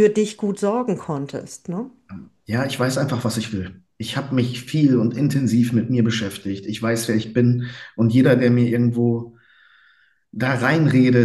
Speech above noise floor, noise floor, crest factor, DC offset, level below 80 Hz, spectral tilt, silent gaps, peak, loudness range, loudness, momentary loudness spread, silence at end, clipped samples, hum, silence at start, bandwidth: 39 dB; -58 dBFS; 18 dB; under 0.1%; -58 dBFS; -6.5 dB/octave; none; -2 dBFS; 5 LU; -20 LUFS; 15 LU; 0 s; under 0.1%; none; 0 s; 12.5 kHz